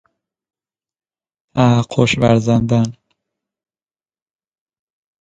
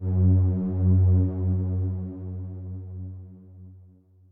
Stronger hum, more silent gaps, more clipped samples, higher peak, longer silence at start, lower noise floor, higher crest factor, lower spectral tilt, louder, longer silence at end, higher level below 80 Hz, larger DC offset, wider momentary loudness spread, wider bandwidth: neither; neither; neither; first, 0 dBFS vs -12 dBFS; first, 1.55 s vs 0 s; first, under -90 dBFS vs -54 dBFS; about the same, 18 dB vs 14 dB; second, -6.5 dB/octave vs -15 dB/octave; first, -15 LUFS vs -24 LUFS; first, 2.3 s vs 0.5 s; about the same, -48 dBFS vs -44 dBFS; neither; second, 7 LU vs 17 LU; first, 9.2 kHz vs 1.5 kHz